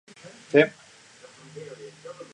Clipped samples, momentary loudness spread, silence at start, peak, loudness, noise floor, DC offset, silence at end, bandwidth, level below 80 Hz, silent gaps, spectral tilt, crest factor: under 0.1%; 25 LU; 0.55 s; -2 dBFS; -22 LUFS; -51 dBFS; under 0.1%; 0.2 s; 10.5 kHz; -76 dBFS; none; -5.5 dB/octave; 26 dB